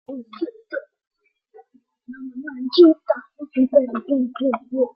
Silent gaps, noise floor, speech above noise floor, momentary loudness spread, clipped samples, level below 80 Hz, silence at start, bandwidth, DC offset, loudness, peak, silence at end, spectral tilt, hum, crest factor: 1.07-1.11 s; -54 dBFS; 34 dB; 21 LU; under 0.1%; -72 dBFS; 0.1 s; 5.6 kHz; under 0.1%; -20 LUFS; -2 dBFS; 0.1 s; -8 dB/octave; none; 18 dB